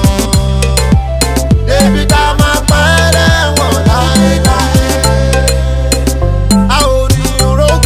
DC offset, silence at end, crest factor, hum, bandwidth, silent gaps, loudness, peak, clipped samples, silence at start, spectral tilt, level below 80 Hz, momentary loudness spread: under 0.1%; 0 s; 8 dB; none; 16 kHz; none; -10 LUFS; 0 dBFS; 0.4%; 0 s; -4.5 dB/octave; -14 dBFS; 4 LU